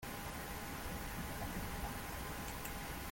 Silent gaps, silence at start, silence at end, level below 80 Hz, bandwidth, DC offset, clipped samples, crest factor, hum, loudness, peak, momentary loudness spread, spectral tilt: none; 0 s; 0 s; -50 dBFS; 17 kHz; under 0.1%; under 0.1%; 14 dB; none; -44 LUFS; -30 dBFS; 2 LU; -4 dB/octave